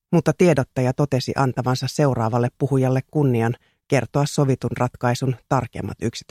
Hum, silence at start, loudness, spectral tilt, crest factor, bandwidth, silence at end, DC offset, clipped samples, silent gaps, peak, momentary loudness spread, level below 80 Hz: none; 0.1 s; -21 LUFS; -6.5 dB/octave; 18 dB; 14 kHz; 0.1 s; under 0.1%; under 0.1%; none; -4 dBFS; 7 LU; -50 dBFS